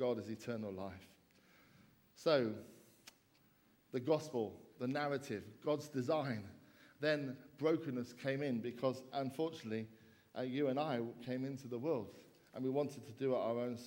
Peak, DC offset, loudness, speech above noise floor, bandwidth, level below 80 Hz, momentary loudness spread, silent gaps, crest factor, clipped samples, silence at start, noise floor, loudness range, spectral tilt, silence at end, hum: -22 dBFS; under 0.1%; -40 LUFS; 32 dB; 16.5 kHz; -82 dBFS; 11 LU; none; 20 dB; under 0.1%; 0 s; -72 dBFS; 3 LU; -6.5 dB/octave; 0 s; none